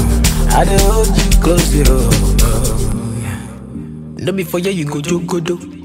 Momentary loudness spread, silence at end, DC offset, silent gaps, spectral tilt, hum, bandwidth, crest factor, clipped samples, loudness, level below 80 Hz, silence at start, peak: 14 LU; 0 s; under 0.1%; none; -5 dB/octave; none; 16.5 kHz; 12 dB; under 0.1%; -15 LUFS; -16 dBFS; 0 s; 0 dBFS